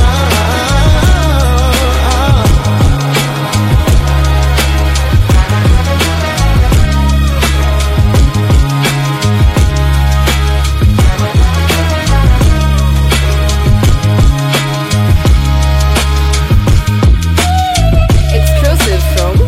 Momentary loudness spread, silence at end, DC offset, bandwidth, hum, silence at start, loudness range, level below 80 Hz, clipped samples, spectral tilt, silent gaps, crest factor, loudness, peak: 2 LU; 0 s; under 0.1%; 16 kHz; none; 0 s; 0 LU; -12 dBFS; 0.4%; -5 dB/octave; none; 8 dB; -10 LUFS; 0 dBFS